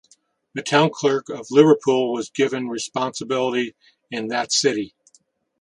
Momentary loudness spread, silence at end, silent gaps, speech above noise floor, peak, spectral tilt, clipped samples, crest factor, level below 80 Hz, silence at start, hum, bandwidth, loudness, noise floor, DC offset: 14 LU; 0.75 s; none; 41 dB; 0 dBFS; -4 dB/octave; under 0.1%; 20 dB; -68 dBFS; 0.55 s; none; 11 kHz; -21 LUFS; -61 dBFS; under 0.1%